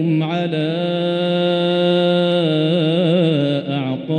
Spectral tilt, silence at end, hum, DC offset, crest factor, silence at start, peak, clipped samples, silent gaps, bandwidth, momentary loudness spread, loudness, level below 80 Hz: -8 dB/octave; 0 s; none; under 0.1%; 12 dB; 0 s; -6 dBFS; under 0.1%; none; 9.2 kHz; 4 LU; -17 LUFS; -64 dBFS